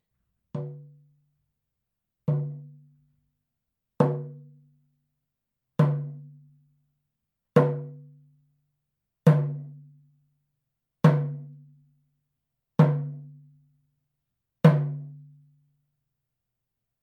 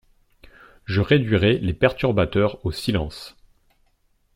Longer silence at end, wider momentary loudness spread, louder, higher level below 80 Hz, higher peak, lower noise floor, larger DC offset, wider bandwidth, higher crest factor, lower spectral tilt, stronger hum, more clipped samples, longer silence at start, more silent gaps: first, 1.85 s vs 1.05 s; first, 22 LU vs 16 LU; second, -25 LUFS vs -21 LUFS; second, -78 dBFS vs -42 dBFS; about the same, -4 dBFS vs -4 dBFS; first, -84 dBFS vs -64 dBFS; neither; second, 6 kHz vs 15.5 kHz; first, 26 dB vs 20 dB; first, -9.5 dB/octave vs -7 dB/octave; neither; neither; second, 0.55 s vs 0.9 s; neither